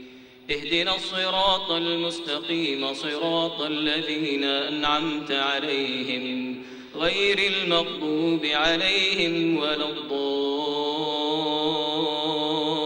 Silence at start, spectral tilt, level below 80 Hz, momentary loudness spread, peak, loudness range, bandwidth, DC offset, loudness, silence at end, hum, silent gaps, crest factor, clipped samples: 0 s; -4 dB/octave; -56 dBFS; 7 LU; -6 dBFS; 3 LU; 16 kHz; under 0.1%; -24 LUFS; 0 s; none; none; 18 dB; under 0.1%